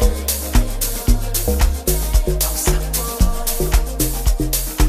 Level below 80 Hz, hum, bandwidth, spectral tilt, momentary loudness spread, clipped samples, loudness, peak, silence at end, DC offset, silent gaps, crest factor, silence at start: -18 dBFS; none; 15.5 kHz; -4 dB/octave; 3 LU; under 0.1%; -19 LUFS; -2 dBFS; 0 s; under 0.1%; none; 16 dB; 0 s